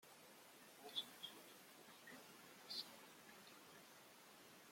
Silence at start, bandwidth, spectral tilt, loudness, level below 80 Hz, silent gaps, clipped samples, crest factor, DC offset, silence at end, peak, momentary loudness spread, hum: 0 s; 16.5 kHz; -1 dB/octave; -56 LUFS; under -90 dBFS; none; under 0.1%; 26 dB; under 0.1%; 0 s; -34 dBFS; 14 LU; none